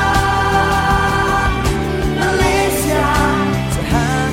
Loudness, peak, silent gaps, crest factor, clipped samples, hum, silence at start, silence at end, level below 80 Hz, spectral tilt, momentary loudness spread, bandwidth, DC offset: -15 LUFS; 0 dBFS; none; 14 dB; under 0.1%; none; 0 s; 0 s; -24 dBFS; -5 dB/octave; 4 LU; 16.5 kHz; under 0.1%